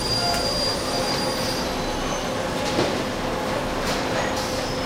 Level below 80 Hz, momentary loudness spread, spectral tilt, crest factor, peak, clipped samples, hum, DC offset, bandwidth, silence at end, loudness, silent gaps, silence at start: -38 dBFS; 4 LU; -3.5 dB/octave; 16 dB; -10 dBFS; under 0.1%; none; under 0.1%; 16 kHz; 0 s; -24 LUFS; none; 0 s